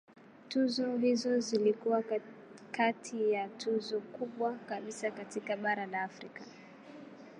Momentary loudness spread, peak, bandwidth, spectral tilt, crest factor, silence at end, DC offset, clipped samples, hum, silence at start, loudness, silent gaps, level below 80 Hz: 20 LU; -16 dBFS; 11 kHz; -4.5 dB/octave; 18 dB; 0 s; under 0.1%; under 0.1%; none; 0.3 s; -34 LUFS; none; -88 dBFS